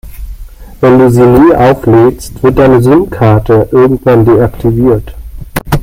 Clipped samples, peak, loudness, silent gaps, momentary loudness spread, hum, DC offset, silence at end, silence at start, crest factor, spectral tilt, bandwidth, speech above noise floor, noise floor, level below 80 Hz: 0.7%; 0 dBFS; -7 LUFS; none; 10 LU; none; under 0.1%; 0 s; 0.05 s; 6 dB; -8 dB/octave; 16.5 kHz; 21 dB; -27 dBFS; -24 dBFS